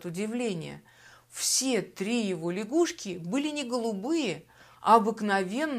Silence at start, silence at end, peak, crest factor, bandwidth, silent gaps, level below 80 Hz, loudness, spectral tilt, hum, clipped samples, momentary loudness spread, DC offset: 0 s; 0 s; -8 dBFS; 22 dB; 15.5 kHz; none; -72 dBFS; -28 LUFS; -3.5 dB/octave; none; under 0.1%; 14 LU; under 0.1%